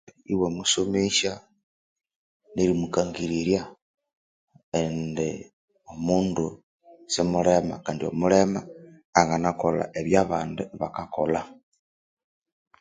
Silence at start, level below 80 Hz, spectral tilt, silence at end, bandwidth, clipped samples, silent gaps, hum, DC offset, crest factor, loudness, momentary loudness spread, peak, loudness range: 0.3 s; -54 dBFS; -4.5 dB/octave; 1.25 s; 9.6 kHz; under 0.1%; 1.63-1.96 s, 2.16-2.40 s, 3.82-3.94 s, 4.17-4.47 s, 4.63-4.72 s, 5.53-5.68 s, 6.63-6.79 s, 9.05-9.13 s; none; under 0.1%; 26 dB; -25 LUFS; 11 LU; 0 dBFS; 5 LU